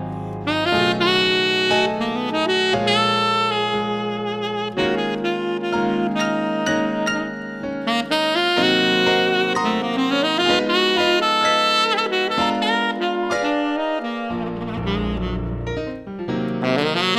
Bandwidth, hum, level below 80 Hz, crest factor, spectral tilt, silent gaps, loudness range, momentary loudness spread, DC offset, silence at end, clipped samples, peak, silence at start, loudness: 15.5 kHz; none; -42 dBFS; 16 dB; -4.5 dB/octave; none; 5 LU; 10 LU; under 0.1%; 0 s; under 0.1%; -4 dBFS; 0 s; -20 LUFS